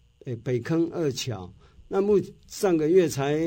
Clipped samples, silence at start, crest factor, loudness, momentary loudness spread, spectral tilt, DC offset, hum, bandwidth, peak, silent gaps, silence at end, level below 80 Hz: under 0.1%; 0.25 s; 16 dB; -25 LUFS; 16 LU; -6 dB/octave; under 0.1%; none; 16.5 kHz; -8 dBFS; none; 0 s; -56 dBFS